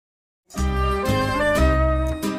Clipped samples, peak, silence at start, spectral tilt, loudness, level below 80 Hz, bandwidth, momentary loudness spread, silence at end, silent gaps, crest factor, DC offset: under 0.1%; -6 dBFS; 0.5 s; -6 dB/octave; -21 LUFS; -26 dBFS; 16 kHz; 8 LU; 0 s; none; 14 dB; under 0.1%